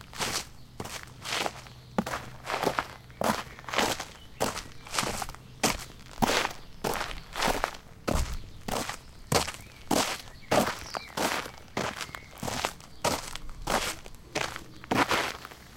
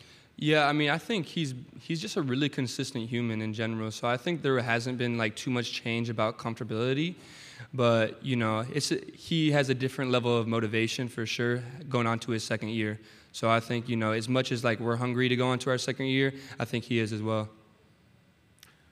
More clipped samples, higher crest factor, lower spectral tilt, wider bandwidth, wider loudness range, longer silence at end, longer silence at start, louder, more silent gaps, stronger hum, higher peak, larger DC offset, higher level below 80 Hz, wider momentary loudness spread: neither; about the same, 26 dB vs 22 dB; second, -3 dB/octave vs -5.5 dB/octave; first, 17 kHz vs 14.5 kHz; about the same, 3 LU vs 3 LU; second, 0 s vs 1.4 s; second, 0 s vs 0.4 s; about the same, -31 LUFS vs -29 LUFS; neither; neither; about the same, -6 dBFS vs -8 dBFS; neither; first, -46 dBFS vs -70 dBFS; first, 12 LU vs 8 LU